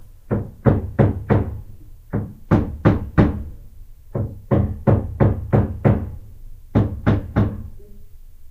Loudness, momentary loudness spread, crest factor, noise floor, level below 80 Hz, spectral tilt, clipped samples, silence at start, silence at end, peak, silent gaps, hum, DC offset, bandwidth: -21 LUFS; 14 LU; 20 dB; -39 dBFS; -30 dBFS; -10.5 dB/octave; under 0.1%; 0 s; 0.05 s; 0 dBFS; none; none; under 0.1%; 4.5 kHz